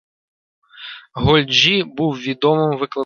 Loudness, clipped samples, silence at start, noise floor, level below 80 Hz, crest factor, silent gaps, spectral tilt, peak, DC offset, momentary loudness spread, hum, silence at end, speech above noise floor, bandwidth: -16 LUFS; under 0.1%; 0.75 s; -37 dBFS; -42 dBFS; 18 dB; none; -5 dB/octave; 0 dBFS; under 0.1%; 21 LU; none; 0 s; 21 dB; 7 kHz